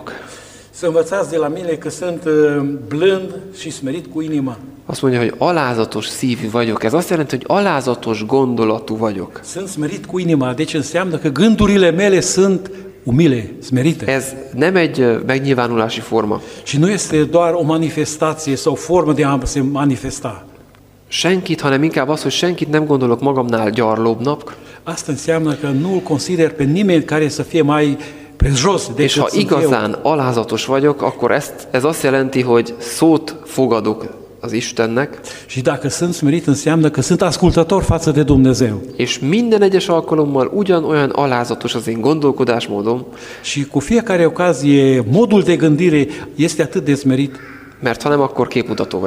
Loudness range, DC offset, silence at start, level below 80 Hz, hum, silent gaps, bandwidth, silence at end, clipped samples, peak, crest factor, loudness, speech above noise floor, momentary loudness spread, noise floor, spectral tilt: 4 LU; under 0.1%; 0 s; -38 dBFS; none; none; 16 kHz; 0 s; under 0.1%; -2 dBFS; 14 dB; -16 LUFS; 30 dB; 10 LU; -45 dBFS; -5.5 dB/octave